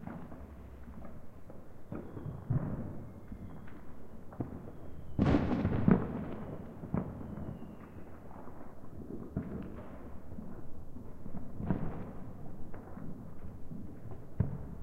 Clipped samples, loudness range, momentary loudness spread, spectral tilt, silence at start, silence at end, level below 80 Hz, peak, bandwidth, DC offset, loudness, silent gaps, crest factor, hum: under 0.1%; 12 LU; 20 LU; -9.5 dB/octave; 0 s; 0 s; -48 dBFS; -10 dBFS; 6.6 kHz; under 0.1%; -39 LUFS; none; 26 dB; none